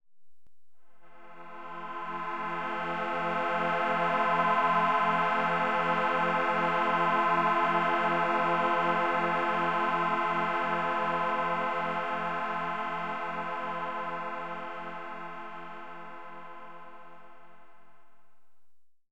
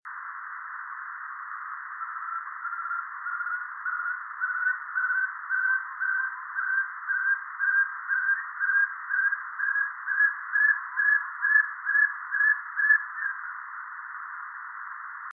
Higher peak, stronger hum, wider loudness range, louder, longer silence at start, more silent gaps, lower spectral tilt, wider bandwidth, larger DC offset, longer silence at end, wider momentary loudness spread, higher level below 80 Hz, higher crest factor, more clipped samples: second, -14 dBFS vs -10 dBFS; neither; first, 14 LU vs 9 LU; second, -29 LUFS vs -26 LUFS; about the same, 0 s vs 0.05 s; neither; first, -6 dB/octave vs 3 dB/octave; first, 10 kHz vs 2.3 kHz; first, 0.6% vs under 0.1%; about the same, 0 s vs 0 s; about the same, 17 LU vs 15 LU; about the same, -88 dBFS vs under -90 dBFS; about the same, 16 dB vs 18 dB; neither